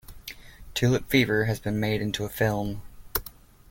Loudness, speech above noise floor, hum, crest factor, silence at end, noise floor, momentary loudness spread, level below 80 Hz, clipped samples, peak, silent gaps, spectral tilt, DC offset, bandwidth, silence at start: -26 LUFS; 22 dB; none; 20 dB; 0.4 s; -47 dBFS; 19 LU; -46 dBFS; under 0.1%; -6 dBFS; none; -5.5 dB/octave; under 0.1%; 17 kHz; 0.1 s